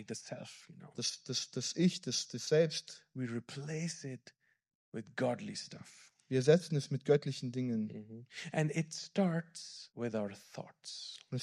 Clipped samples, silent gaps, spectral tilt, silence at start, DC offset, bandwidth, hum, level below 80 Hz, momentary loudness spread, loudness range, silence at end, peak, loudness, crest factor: under 0.1%; 4.75-4.92 s; -5 dB/octave; 0 s; under 0.1%; 12.5 kHz; none; -82 dBFS; 18 LU; 5 LU; 0 s; -14 dBFS; -36 LUFS; 24 dB